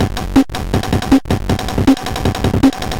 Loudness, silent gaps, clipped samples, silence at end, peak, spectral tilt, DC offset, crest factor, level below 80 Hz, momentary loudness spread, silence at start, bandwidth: -15 LUFS; none; under 0.1%; 0 s; 0 dBFS; -6 dB/octave; under 0.1%; 14 dB; -26 dBFS; 4 LU; 0 s; 17 kHz